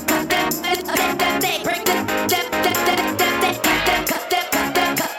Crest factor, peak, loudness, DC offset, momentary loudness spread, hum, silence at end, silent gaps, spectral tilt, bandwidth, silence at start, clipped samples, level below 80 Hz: 16 dB; -4 dBFS; -19 LUFS; under 0.1%; 3 LU; none; 0 s; none; -2.5 dB/octave; 19 kHz; 0 s; under 0.1%; -46 dBFS